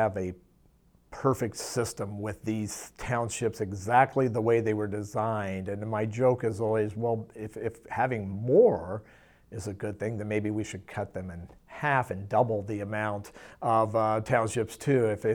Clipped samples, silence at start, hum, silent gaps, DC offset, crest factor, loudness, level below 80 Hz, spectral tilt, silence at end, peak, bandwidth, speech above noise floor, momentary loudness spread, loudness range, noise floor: under 0.1%; 0 s; none; none; under 0.1%; 22 dB; -29 LUFS; -58 dBFS; -6 dB/octave; 0 s; -8 dBFS; 18.5 kHz; 34 dB; 13 LU; 5 LU; -62 dBFS